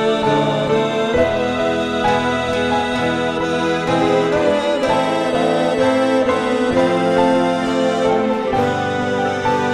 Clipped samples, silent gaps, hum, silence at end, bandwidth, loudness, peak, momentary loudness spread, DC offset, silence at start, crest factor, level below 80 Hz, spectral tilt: under 0.1%; none; none; 0 s; 12 kHz; -17 LUFS; -2 dBFS; 3 LU; under 0.1%; 0 s; 14 dB; -44 dBFS; -5.5 dB/octave